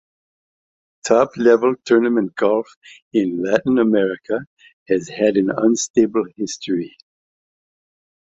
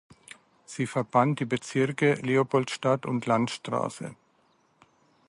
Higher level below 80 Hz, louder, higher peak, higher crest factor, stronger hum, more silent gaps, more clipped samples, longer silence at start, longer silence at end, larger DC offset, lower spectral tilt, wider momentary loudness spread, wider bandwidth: first, -62 dBFS vs -70 dBFS; first, -18 LUFS vs -27 LUFS; first, -2 dBFS vs -8 dBFS; about the same, 18 dB vs 20 dB; neither; first, 2.76-2.81 s, 3.02-3.11 s, 4.47-4.57 s, 4.73-4.86 s, 5.90-5.94 s vs none; neither; first, 1.05 s vs 0.7 s; first, 1.4 s vs 1.15 s; neither; about the same, -5 dB/octave vs -6 dB/octave; about the same, 11 LU vs 10 LU; second, 8 kHz vs 11.5 kHz